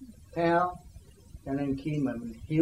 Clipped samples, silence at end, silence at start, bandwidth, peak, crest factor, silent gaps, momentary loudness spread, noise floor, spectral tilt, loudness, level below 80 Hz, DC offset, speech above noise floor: under 0.1%; 0 s; 0 s; 14 kHz; -14 dBFS; 18 dB; none; 14 LU; -51 dBFS; -8 dB/octave; -31 LUFS; -52 dBFS; under 0.1%; 23 dB